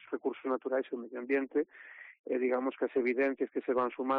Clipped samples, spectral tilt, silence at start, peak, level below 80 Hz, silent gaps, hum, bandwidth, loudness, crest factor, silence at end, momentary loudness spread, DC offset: under 0.1%; -3.5 dB/octave; 0.05 s; -20 dBFS; -80 dBFS; 2.19-2.24 s; none; 5 kHz; -33 LUFS; 14 dB; 0 s; 10 LU; under 0.1%